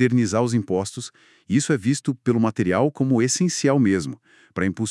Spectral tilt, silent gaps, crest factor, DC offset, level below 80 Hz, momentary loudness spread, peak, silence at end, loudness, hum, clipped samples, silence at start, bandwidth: -5.5 dB/octave; none; 16 dB; under 0.1%; -64 dBFS; 13 LU; -6 dBFS; 0 s; -21 LUFS; none; under 0.1%; 0 s; 12 kHz